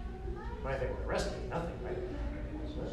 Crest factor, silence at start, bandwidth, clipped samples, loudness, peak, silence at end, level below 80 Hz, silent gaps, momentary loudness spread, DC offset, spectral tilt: 14 dB; 0 s; 12 kHz; under 0.1%; -39 LUFS; -22 dBFS; 0 s; -42 dBFS; none; 6 LU; under 0.1%; -6 dB/octave